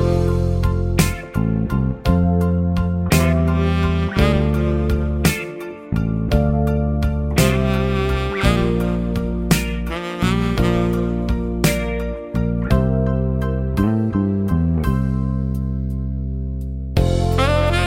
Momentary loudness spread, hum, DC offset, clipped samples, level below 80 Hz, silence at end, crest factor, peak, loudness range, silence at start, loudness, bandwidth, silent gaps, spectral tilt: 7 LU; none; under 0.1%; under 0.1%; -26 dBFS; 0 s; 18 dB; 0 dBFS; 3 LU; 0 s; -19 LUFS; 16.5 kHz; none; -6.5 dB/octave